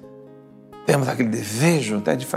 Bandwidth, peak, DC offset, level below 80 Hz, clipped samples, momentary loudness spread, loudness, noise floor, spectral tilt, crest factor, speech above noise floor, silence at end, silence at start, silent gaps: 16 kHz; -4 dBFS; under 0.1%; -66 dBFS; under 0.1%; 4 LU; -21 LUFS; -45 dBFS; -5.5 dB/octave; 18 dB; 24 dB; 0 s; 0.05 s; none